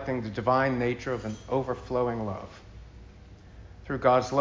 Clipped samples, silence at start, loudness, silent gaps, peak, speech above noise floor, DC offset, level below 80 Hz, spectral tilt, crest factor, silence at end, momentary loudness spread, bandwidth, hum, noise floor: under 0.1%; 0 s; -28 LUFS; none; -8 dBFS; 22 dB; under 0.1%; -50 dBFS; -6.5 dB/octave; 20 dB; 0 s; 23 LU; 7.6 kHz; none; -49 dBFS